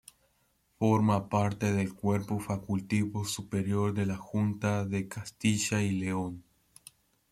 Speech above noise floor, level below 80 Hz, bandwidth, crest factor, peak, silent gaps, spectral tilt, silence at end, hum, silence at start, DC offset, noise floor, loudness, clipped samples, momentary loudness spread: 42 dB; -62 dBFS; 15 kHz; 18 dB; -14 dBFS; none; -6 dB/octave; 0.9 s; none; 0.8 s; under 0.1%; -72 dBFS; -31 LUFS; under 0.1%; 7 LU